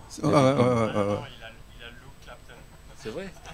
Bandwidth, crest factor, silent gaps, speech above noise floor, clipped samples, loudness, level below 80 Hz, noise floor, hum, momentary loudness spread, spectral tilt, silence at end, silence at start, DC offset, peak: 15.5 kHz; 22 dB; none; 23 dB; under 0.1%; -24 LUFS; -50 dBFS; -47 dBFS; 50 Hz at -55 dBFS; 25 LU; -6.5 dB/octave; 0 s; 0 s; under 0.1%; -6 dBFS